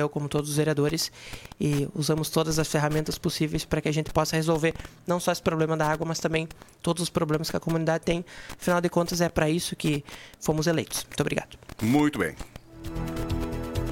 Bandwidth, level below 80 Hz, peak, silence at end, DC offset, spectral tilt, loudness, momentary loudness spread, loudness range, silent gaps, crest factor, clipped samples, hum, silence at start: 17 kHz; -44 dBFS; -8 dBFS; 0 s; under 0.1%; -5 dB/octave; -27 LUFS; 8 LU; 2 LU; none; 20 dB; under 0.1%; none; 0 s